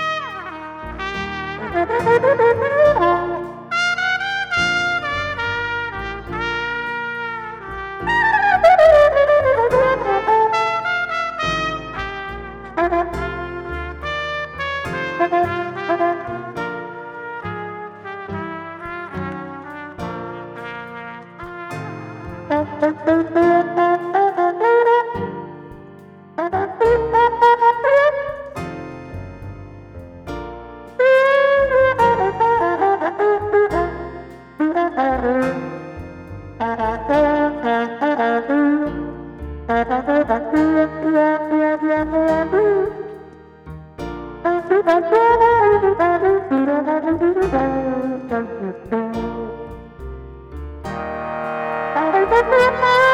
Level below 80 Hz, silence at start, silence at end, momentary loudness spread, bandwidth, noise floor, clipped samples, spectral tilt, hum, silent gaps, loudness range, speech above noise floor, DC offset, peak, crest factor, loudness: -42 dBFS; 0 s; 0 s; 18 LU; 12 kHz; -41 dBFS; under 0.1%; -6 dB/octave; none; none; 11 LU; 26 dB; under 0.1%; -2 dBFS; 16 dB; -18 LUFS